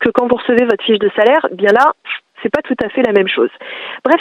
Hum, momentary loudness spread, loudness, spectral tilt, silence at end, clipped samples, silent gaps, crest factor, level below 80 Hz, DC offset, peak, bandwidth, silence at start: none; 11 LU; -14 LUFS; -6 dB/octave; 0 s; under 0.1%; none; 14 dB; -54 dBFS; under 0.1%; 0 dBFS; 8.8 kHz; 0 s